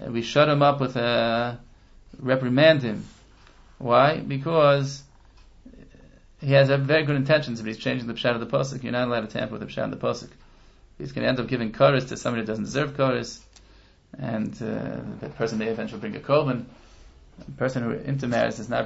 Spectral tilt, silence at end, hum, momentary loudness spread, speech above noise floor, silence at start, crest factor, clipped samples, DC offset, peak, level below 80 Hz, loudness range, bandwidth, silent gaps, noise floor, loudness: -6 dB/octave; 0 s; none; 15 LU; 30 dB; 0 s; 20 dB; under 0.1%; under 0.1%; -4 dBFS; -52 dBFS; 7 LU; 8 kHz; none; -54 dBFS; -24 LUFS